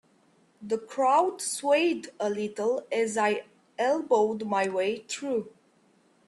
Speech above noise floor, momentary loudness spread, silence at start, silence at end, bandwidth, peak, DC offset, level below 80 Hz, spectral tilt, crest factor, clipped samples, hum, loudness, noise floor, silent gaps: 37 dB; 9 LU; 0.6 s; 0.8 s; 12.5 kHz; -12 dBFS; under 0.1%; -76 dBFS; -3.5 dB/octave; 16 dB; under 0.1%; none; -27 LUFS; -64 dBFS; none